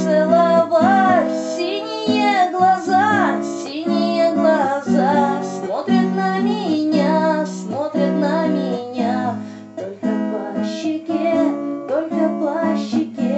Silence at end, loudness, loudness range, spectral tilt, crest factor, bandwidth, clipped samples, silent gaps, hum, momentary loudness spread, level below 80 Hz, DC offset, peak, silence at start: 0 s; -18 LUFS; 5 LU; -6 dB/octave; 16 dB; 8.4 kHz; under 0.1%; none; none; 9 LU; -74 dBFS; under 0.1%; -2 dBFS; 0 s